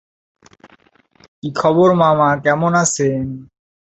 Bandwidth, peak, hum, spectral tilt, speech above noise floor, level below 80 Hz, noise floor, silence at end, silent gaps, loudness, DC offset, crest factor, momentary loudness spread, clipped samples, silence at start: 8.4 kHz; -2 dBFS; none; -5 dB/octave; 39 dB; -52 dBFS; -53 dBFS; 0.55 s; none; -15 LUFS; under 0.1%; 16 dB; 15 LU; under 0.1%; 1.45 s